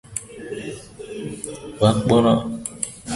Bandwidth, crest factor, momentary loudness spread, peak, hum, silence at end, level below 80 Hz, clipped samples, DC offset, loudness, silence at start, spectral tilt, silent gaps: 11.5 kHz; 22 dB; 18 LU; -2 dBFS; none; 0 s; -48 dBFS; under 0.1%; under 0.1%; -22 LUFS; 0.1 s; -5.5 dB/octave; none